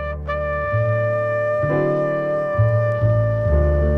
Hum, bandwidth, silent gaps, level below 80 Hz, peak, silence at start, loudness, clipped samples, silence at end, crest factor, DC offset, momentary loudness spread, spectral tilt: none; 4.4 kHz; none; -28 dBFS; -6 dBFS; 0 s; -20 LUFS; under 0.1%; 0 s; 12 dB; under 0.1%; 4 LU; -10 dB/octave